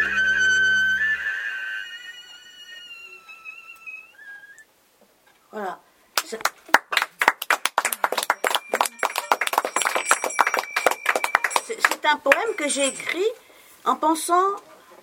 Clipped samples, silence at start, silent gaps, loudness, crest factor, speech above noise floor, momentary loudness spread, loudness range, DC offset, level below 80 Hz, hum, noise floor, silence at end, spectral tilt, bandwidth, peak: under 0.1%; 0 s; none; -22 LUFS; 24 dB; 37 dB; 21 LU; 17 LU; under 0.1%; -62 dBFS; none; -59 dBFS; 0.3 s; 0 dB/octave; 17 kHz; 0 dBFS